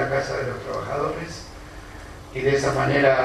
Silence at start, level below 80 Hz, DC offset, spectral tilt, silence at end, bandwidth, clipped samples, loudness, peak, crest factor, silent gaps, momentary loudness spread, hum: 0 s; -44 dBFS; under 0.1%; -5.5 dB/octave; 0 s; 13.5 kHz; under 0.1%; -24 LUFS; -4 dBFS; 20 dB; none; 20 LU; none